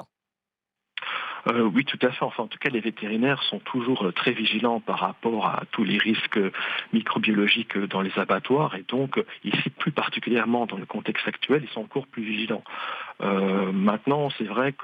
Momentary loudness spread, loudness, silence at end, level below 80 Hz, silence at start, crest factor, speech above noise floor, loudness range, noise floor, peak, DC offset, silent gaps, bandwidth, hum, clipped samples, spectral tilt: 8 LU; -25 LUFS; 0 s; -76 dBFS; 0 s; 18 dB; 63 dB; 3 LU; -88 dBFS; -8 dBFS; under 0.1%; none; 5.2 kHz; none; under 0.1%; -7.5 dB/octave